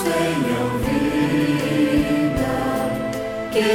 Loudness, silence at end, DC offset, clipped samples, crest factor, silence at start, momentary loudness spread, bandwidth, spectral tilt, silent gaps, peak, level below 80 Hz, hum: -21 LUFS; 0 s; under 0.1%; under 0.1%; 12 dB; 0 s; 5 LU; 17 kHz; -5.5 dB/octave; none; -6 dBFS; -38 dBFS; none